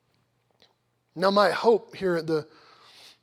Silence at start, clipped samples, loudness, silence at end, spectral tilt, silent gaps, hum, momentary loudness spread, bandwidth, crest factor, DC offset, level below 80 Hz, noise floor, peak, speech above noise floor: 1.15 s; under 0.1%; -24 LUFS; 0.8 s; -5.5 dB/octave; none; none; 9 LU; 15 kHz; 20 dB; under 0.1%; -70 dBFS; -70 dBFS; -8 dBFS; 46 dB